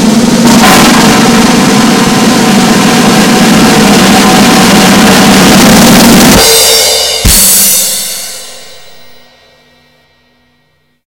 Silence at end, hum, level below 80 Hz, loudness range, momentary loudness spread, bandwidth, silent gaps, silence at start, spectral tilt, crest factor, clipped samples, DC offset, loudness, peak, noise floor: 2.35 s; none; -26 dBFS; 6 LU; 4 LU; over 20 kHz; none; 0 s; -3 dB/octave; 4 dB; 10%; 1%; -3 LUFS; 0 dBFS; -53 dBFS